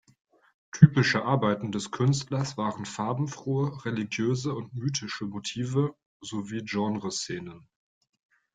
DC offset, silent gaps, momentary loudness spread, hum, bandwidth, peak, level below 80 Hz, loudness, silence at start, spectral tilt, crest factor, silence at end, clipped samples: under 0.1%; 6.06-6.20 s; 12 LU; none; 9.4 kHz; -2 dBFS; -62 dBFS; -28 LUFS; 0.75 s; -6 dB/octave; 26 dB; 0.95 s; under 0.1%